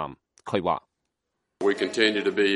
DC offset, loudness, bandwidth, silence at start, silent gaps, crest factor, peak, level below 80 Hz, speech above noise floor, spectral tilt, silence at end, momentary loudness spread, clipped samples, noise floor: under 0.1%; -25 LUFS; 11.5 kHz; 0 s; none; 20 dB; -6 dBFS; -64 dBFS; 56 dB; -4.5 dB/octave; 0 s; 11 LU; under 0.1%; -80 dBFS